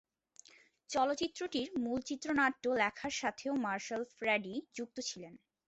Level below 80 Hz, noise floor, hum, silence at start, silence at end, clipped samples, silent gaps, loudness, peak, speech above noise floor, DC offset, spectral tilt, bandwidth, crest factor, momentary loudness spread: -72 dBFS; -63 dBFS; none; 0.9 s; 0.3 s; under 0.1%; none; -36 LUFS; -18 dBFS; 26 dB; under 0.1%; -3 dB/octave; 8.2 kHz; 20 dB; 10 LU